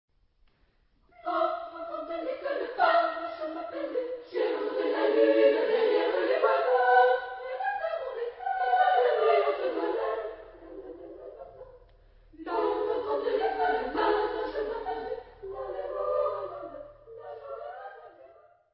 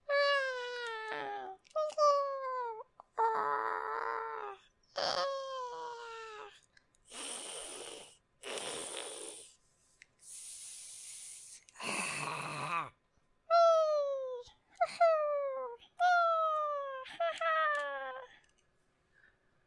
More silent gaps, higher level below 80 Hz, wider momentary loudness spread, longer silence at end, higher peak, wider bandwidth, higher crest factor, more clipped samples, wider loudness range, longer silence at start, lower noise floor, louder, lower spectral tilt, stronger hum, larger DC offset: neither; first, -62 dBFS vs -80 dBFS; first, 21 LU vs 18 LU; second, 0.45 s vs 1.35 s; first, -10 dBFS vs -18 dBFS; second, 5.6 kHz vs 11.5 kHz; about the same, 20 dB vs 18 dB; neither; about the same, 10 LU vs 12 LU; first, 1.25 s vs 0.1 s; second, -67 dBFS vs -74 dBFS; first, -28 LUFS vs -35 LUFS; first, -7.5 dB/octave vs -1.5 dB/octave; neither; neither